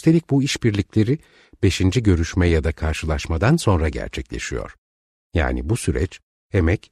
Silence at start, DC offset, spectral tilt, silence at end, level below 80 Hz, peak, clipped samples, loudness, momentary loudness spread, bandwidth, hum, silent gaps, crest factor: 0.05 s; under 0.1%; -6 dB/octave; 0.15 s; -30 dBFS; -4 dBFS; under 0.1%; -21 LUFS; 10 LU; 13.5 kHz; none; 4.78-5.30 s, 6.23-6.50 s; 16 dB